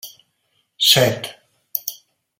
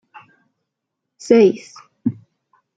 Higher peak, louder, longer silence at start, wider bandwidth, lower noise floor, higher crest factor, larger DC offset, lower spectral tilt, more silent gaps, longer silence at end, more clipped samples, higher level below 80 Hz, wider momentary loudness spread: about the same, 0 dBFS vs -2 dBFS; about the same, -17 LUFS vs -17 LUFS; second, 0.05 s vs 1.25 s; first, 16.5 kHz vs 9 kHz; second, -68 dBFS vs -79 dBFS; about the same, 22 dB vs 18 dB; neither; second, -2.5 dB/octave vs -6.5 dB/octave; neither; second, 0.45 s vs 0.65 s; neither; about the same, -60 dBFS vs -64 dBFS; about the same, 20 LU vs 18 LU